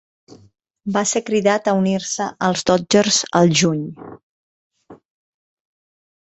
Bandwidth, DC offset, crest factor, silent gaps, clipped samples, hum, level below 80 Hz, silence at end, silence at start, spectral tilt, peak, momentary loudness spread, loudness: 8.2 kHz; under 0.1%; 18 dB; 4.23-4.70 s; under 0.1%; none; -56 dBFS; 1.25 s; 0.85 s; -4 dB/octave; -2 dBFS; 11 LU; -17 LUFS